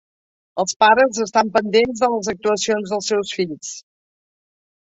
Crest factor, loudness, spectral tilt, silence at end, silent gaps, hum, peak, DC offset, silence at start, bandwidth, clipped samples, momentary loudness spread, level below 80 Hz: 18 dB; -18 LUFS; -3 dB/octave; 1.05 s; 0.76-0.80 s; none; -2 dBFS; under 0.1%; 0.55 s; 8.2 kHz; under 0.1%; 14 LU; -58 dBFS